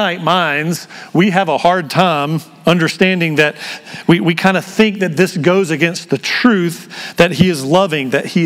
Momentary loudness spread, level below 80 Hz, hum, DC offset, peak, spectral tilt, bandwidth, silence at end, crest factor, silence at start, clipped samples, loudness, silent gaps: 8 LU; -50 dBFS; none; under 0.1%; 0 dBFS; -5.5 dB/octave; 16 kHz; 0 s; 14 dB; 0 s; 0.2%; -14 LUFS; none